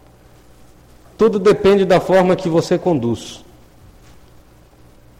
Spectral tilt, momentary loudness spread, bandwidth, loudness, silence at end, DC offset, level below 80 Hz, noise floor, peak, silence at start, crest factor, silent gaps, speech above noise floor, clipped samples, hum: -6.5 dB/octave; 9 LU; 15 kHz; -15 LUFS; 1.8 s; under 0.1%; -46 dBFS; -46 dBFS; -2 dBFS; 1.2 s; 14 dB; none; 32 dB; under 0.1%; none